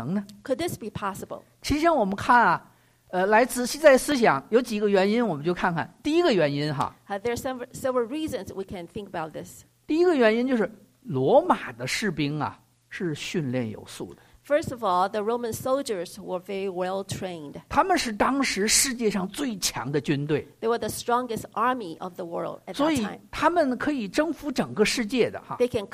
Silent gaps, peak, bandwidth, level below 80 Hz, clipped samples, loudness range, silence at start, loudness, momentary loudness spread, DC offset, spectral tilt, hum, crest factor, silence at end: none; -6 dBFS; 15.5 kHz; -54 dBFS; under 0.1%; 7 LU; 0 s; -25 LUFS; 14 LU; under 0.1%; -4 dB/octave; none; 20 dB; 0.05 s